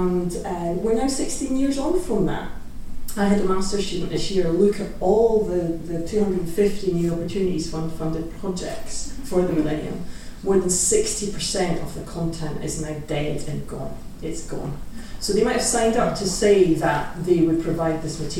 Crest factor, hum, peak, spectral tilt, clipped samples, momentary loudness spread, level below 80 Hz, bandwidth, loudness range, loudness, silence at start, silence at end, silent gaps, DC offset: 16 dB; none; -6 dBFS; -5 dB/octave; under 0.1%; 13 LU; -36 dBFS; 16 kHz; 6 LU; -23 LUFS; 0 s; 0 s; none; under 0.1%